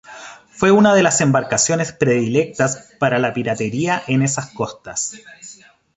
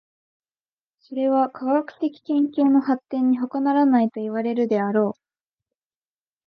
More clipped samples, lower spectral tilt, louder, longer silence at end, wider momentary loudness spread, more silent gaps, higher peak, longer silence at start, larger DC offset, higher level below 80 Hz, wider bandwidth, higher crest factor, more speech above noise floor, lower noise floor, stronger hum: neither; second, -4.5 dB/octave vs -9 dB/octave; first, -17 LUFS vs -22 LUFS; second, 0.45 s vs 1.35 s; first, 23 LU vs 8 LU; neither; first, -2 dBFS vs -8 dBFS; second, 0.1 s vs 1.1 s; neither; first, -54 dBFS vs -78 dBFS; first, 8.4 kHz vs 5.4 kHz; about the same, 16 dB vs 14 dB; second, 21 dB vs over 69 dB; second, -38 dBFS vs under -90 dBFS; neither